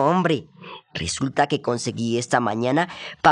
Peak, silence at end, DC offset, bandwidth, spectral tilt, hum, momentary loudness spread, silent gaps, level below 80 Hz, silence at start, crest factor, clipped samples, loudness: -2 dBFS; 0 s; under 0.1%; 11.5 kHz; -5 dB/octave; none; 9 LU; none; -56 dBFS; 0 s; 20 dB; under 0.1%; -23 LUFS